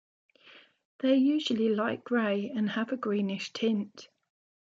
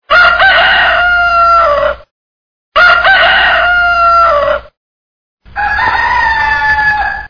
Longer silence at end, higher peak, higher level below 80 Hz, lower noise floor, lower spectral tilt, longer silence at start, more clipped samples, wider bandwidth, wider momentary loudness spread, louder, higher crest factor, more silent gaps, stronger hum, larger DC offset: first, 0.6 s vs 0 s; second, -14 dBFS vs 0 dBFS; second, -80 dBFS vs -32 dBFS; second, -57 dBFS vs under -90 dBFS; first, -6 dB/octave vs -3 dB/octave; first, 0.55 s vs 0.1 s; second, under 0.1% vs 0.3%; first, 7.8 kHz vs 5.4 kHz; about the same, 7 LU vs 9 LU; second, -29 LUFS vs -7 LUFS; first, 16 dB vs 10 dB; second, 0.85-0.99 s vs 2.11-2.72 s, 4.77-5.37 s; neither; neither